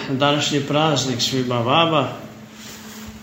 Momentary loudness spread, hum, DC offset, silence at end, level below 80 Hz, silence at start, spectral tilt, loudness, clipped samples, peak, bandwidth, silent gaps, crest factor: 20 LU; none; under 0.1%; 0 s; -54 dBFS; 0 s; -4.5 dB/octave; -19 LUFS; under 0.1%; -2 dBFS; 16 kHz; none; 18 dB